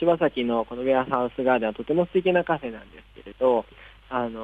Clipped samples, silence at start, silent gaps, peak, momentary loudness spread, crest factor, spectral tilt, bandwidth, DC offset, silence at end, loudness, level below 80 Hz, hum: under 0.1%; 0 s; none; -8 dBFS; 8 LU; 16 dB; -8.5 dB/octave; 4.5 kHz; under 0.1%; 0 s; -24 LUFS; -54 dBFS; none